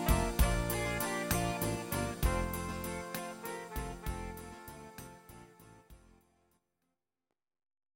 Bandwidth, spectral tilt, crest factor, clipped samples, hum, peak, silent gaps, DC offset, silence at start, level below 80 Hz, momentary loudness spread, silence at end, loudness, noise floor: 17 kHz; -4.5 dB/octave; 22 dB; under 0.1%; none; -14 dBFS; none; under 0.1%; 0 s; -42 dBFS; 19 LU; 2 s; -36 LUFS; under -90 dBFS